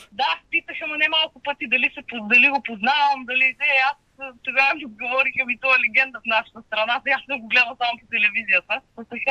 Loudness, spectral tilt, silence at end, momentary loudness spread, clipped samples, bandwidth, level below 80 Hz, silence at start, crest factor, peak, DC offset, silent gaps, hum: -19 LUFS; -3 dB/octave; 0 s; 11 LU; under 0.1%; 9.4 kHz; -66 dBFS; 0 s; 18 dB; -4 dBFS; under 0.1%; none; none